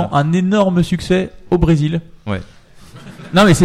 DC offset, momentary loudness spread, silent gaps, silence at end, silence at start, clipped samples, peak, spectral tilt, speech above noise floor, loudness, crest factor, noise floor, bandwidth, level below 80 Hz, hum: under 0.1%; 12 LU; none; 0 s; 0 s; under 0.1%; -2 dBFS; -6.5 dB/octave; 25 dB; -16 LUFS; 14 dB; -39 dBFS; 13.5 kHz; -32 dBFS; none